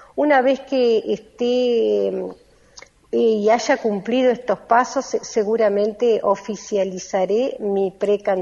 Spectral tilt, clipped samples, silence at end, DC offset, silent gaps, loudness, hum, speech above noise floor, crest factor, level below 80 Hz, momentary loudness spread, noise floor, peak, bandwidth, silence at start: -4.5 dB/octave; under 0.1%; 0 s; under 0.1%; none; -20 LUFS; none; 28 dB; 16 dB; -60 dBFS; 7 LU; -47 dBFS; -2 dBFS; 7.6 kHz; 0.15 s